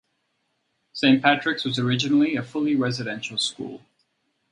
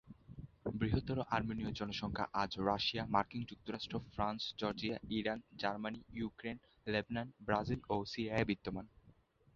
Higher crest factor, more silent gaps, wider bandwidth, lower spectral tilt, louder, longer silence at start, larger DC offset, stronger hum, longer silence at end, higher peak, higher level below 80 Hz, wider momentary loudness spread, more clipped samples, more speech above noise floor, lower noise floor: about the same, 22 dB vs 24 dB; neither; first, 11 kHz vs 7.4 kHz; about the same, -5 dB/octave vs -4 dB/octave; first, -22 LUFS vs -40 LUFS; first, 0.95 s vs 0.05 s; neither; neither; first, 0.75 s vs 0.45 s; first, -2 dBFS vs -16 dBFS; second, -66 dBFS vs -58 dBFS; about the same, 10 LU vs 10 LU; neither; first, 51 dB vs 28 dB; first, -73 dBFS vs -68 dBFS